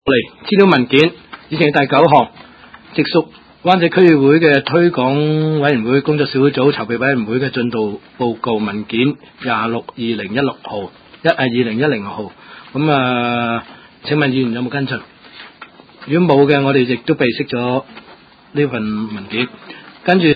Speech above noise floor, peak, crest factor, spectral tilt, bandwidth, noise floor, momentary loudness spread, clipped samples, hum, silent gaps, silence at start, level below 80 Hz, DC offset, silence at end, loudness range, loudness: 28 dB; 0 dBFS; 16 dB; -8.5 dB/octave; 7 kHz; -43 dBFS; 14 LU; under 0.1%; none; none; 0.05 s; -54 dBFS; under 0.1%; 0 s; 6 LU; -15 LUFS